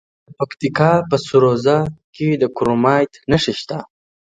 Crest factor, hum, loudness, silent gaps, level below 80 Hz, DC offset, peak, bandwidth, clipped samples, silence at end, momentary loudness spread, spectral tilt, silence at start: 18 dB; none; -17 LUFS; 2.04-2.13 s; -48 dBFS; under 0.1%; 0 dBFS; 9.4 kHz; under 0.1%; 0.45 s; 12 LU; -6.5 dB/octave; 0.3 s